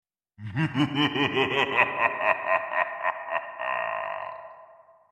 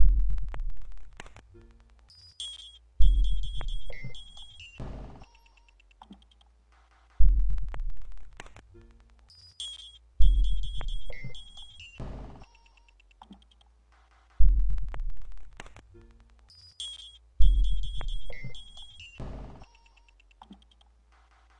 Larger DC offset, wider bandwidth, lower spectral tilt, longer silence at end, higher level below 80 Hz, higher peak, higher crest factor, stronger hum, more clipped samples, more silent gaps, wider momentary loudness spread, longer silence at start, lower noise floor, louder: neither; first, 13 kHz vs 9.2 kHz; about the same, -6 dB/octave vs -5 dB/octave; second, 0.35 s vs 1.95 s; second, -68 dBFS vs -30 dBFS; about the same, -6 dBFS vs -6 dBFS; about the same, 22 dB vs 20 dB; neither; neither; neither; second, 13 LU vs 27 LU; first, 0.4 s vs 0 s; second, -53 dBFS vs -61 dBFS; first, -26 LUFS vs -34 LUFS